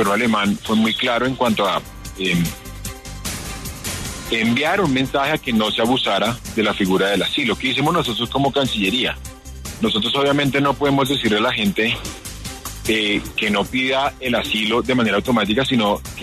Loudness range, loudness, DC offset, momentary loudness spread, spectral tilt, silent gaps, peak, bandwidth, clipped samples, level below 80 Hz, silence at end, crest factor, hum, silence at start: 3 LU; -19 LUFS; under 0.1%; 11 LU; -4.5 dB/octave; none; -6 dBFS; 13.5 kHz; under 0.1%; -40 dBFS; 0 s; 14 dB; none; 0 s